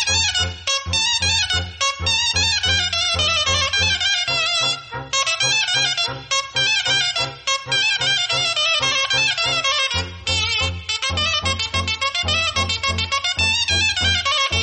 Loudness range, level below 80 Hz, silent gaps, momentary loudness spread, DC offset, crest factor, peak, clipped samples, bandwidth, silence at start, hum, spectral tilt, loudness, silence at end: 2 LU; -40 dBFS; none; 5 LU; under 0.1%; 14 dB; -6 dBFS; under 0.1%; 8.8 kHz; 0 s; none; -1 dB/octave; -18 LUFS; 0 s